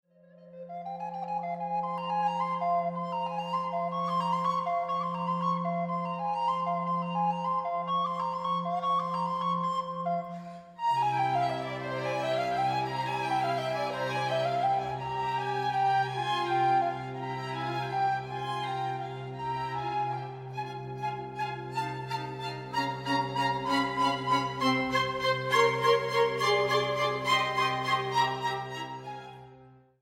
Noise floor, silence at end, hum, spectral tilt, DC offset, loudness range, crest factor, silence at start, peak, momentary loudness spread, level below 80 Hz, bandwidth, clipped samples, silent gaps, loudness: -55 dBFS; 0.3 s; none; -5 dB/octave; under 0.1%; 7 LU; 20 dB; 0.4 s; -10 dBFS; 10 LU; -66 dBFS; 16 kHz; under 0.1%; none; -30 LUFS